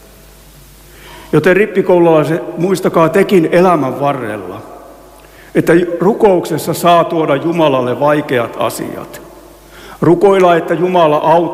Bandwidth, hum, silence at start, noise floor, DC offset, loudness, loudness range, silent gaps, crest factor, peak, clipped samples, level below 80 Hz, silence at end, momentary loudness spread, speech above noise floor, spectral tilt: 16 kHz; none; 1.05 s; -39 dBFS; under 0.1%; -11 LUFS; 3 LU; none; 12 dB; 0 dBFS; under 0.1%; -46 dBFS; 0 s; 11 LU; 28 dB; -6.5 dB/octave